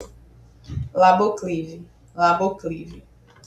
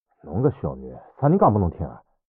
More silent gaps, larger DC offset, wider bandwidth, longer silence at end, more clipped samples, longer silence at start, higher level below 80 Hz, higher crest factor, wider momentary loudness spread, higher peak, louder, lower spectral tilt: neither; neither; first, 9.2 kHz vs 3.3 kHz; first, 0.45 s vs 0.3 s; neither; second, 0 s vs 0.25 s; about the same, -48 dBFS vs -46 dBFS; about the same, 20 dB vs 18 dB; first, 22 LU vs 17 LU; about the same, -4 dBFS vs -6 dBFS; about the same, -20 LUFS vs -22 LUFS; second, -6 dB/octave vs -12 dB/octave